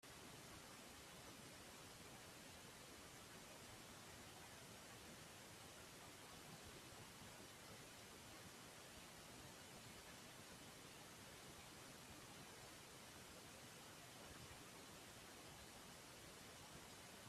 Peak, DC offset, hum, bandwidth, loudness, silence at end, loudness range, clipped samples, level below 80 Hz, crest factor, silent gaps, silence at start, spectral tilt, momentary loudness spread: -46 dBFS; under 0.1%; none; 15.5 kHz; -59 LUFS; 0 s; 0 LU; under 0.1%; -78 dBFS; 16 dB; none; 0 s; -2.5 dB/octave; 1 LU